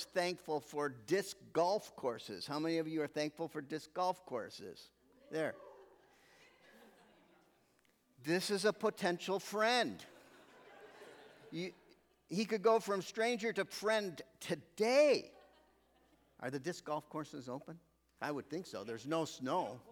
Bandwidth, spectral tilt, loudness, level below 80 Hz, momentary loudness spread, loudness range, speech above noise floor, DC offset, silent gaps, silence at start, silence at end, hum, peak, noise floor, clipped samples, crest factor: 19 kHz; -4 dB/octave; -38 LUFS; -82 dBFS; 19 LU; 10 LU; 36 dB; under 0.1%; none; 0 s; 0 s; none; -20 dBFS; -74 dBFS; under 0.1%; 20 dB